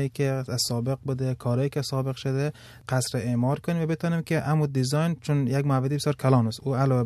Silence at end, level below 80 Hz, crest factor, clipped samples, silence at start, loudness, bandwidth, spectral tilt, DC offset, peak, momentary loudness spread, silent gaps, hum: 0 s; -58 dBFS; 16 dB; under 0.1%; 0 s; -26 LUFS; 13.5 kHz; -6 dB/octave; under 0.1%; -8 dBFS; 5 LU; none; none